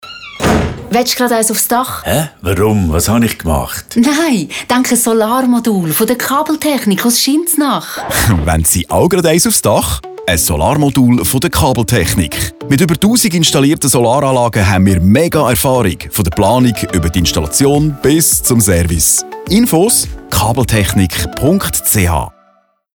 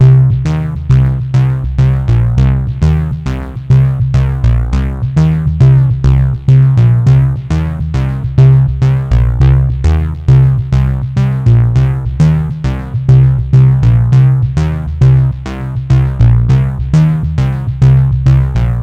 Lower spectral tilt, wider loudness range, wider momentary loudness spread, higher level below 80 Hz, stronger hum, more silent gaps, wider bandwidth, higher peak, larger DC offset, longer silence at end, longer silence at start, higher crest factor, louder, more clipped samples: second, -4.5 dB/octave vs -9 dB/octave; about the same, 2 LU vs 2 LU; about the same, 6 LU vs 7 LU; second, -28 dBFS vs -18 dBFS; neither; neither; first, over 20 kHz vs 6.2 kHz; about the same, 0 dBFS vs 0 dBFS; neither; first, 0.65 s vs 0 s; about the same, 0.05 s vs 0 s; about the same, 12 dB vs 8 dB; about the same, -11 LUFS vs -11 LUFS; second, under 0.1% vs 0.2%